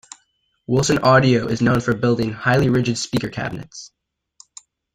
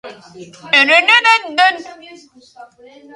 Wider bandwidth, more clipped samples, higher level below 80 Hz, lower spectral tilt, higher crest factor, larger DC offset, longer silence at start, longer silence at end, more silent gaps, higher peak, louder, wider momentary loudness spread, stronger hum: first, 15 kHz vs 11.5 kHz; neither; first, -46 dBFS vs -70 dBFS; first, -5.5 dB/octave vs -1 dB/octave; about the same, 18 dB vs 16 dB; neither; first, 0.7 s vs 0.05 s; first, 1.05 s vs 0.5 s; neither; about the same, -2 dBFS vs 0 dBFS; second, -18 LUFS vs -10 LUFS; first, 14 LU vs 6 LU; neither